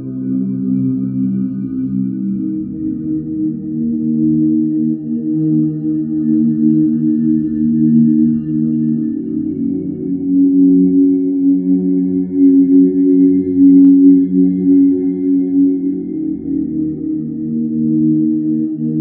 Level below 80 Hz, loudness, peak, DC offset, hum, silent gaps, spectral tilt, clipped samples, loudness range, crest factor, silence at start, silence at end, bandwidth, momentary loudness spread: -50 dBFS; -14 LUFS; 0 dBFS; under 0.1%; none; none; -15 dB/octave; under 0.1%; 7 LU; 12 dB; 0 s; 0 s; 1.3 kHz; 10 LU